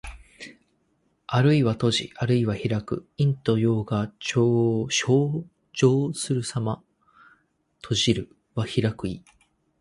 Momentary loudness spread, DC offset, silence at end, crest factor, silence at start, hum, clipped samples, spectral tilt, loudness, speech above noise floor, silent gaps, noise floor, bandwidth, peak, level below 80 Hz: 14 LU; under 0.1%; 0.6 s; 18 dB; 0.05 s; none; under 0.1%; -5.5 dB/octave; -24 LUFS; 46 dB; none; -69 dBFS; 11.5 kHz; -6 dBFS; -52 dBFS